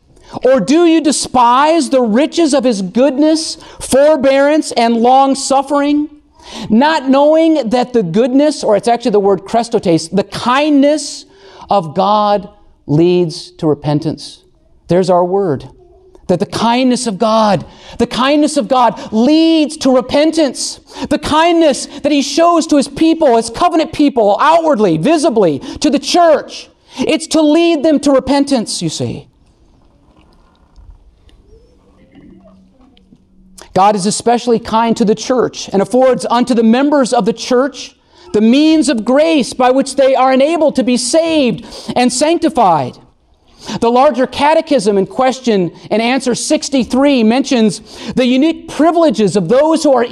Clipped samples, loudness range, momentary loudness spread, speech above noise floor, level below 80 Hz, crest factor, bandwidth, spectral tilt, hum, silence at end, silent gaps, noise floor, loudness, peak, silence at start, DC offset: under 0.1%; 4 LU; 8 LU; 38 dB; -46 dBFS; 10 dB; 12.5 kHz; -4.5 dB/octave; none; 0 s; none; -49 dBFS; -12 LUFS; -2 dBFS; 0.3 s; under 0.1%